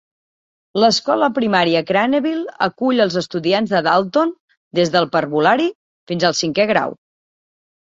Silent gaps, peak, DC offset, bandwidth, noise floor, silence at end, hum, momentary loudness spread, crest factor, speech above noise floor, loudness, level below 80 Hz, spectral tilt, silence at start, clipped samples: 4.40-4.48 s, 4.57-4.71 s, 5.75-6.07 s; -2 dBFS; under 0.1%; 7.8 kHz; under -90 dBFS; 0.9 s; none; 7 LU; 16 dB; over 74 dB; -17 LUFS; -60 dBFS; -4.5 dB/octave; 0.75 s; under 0.1%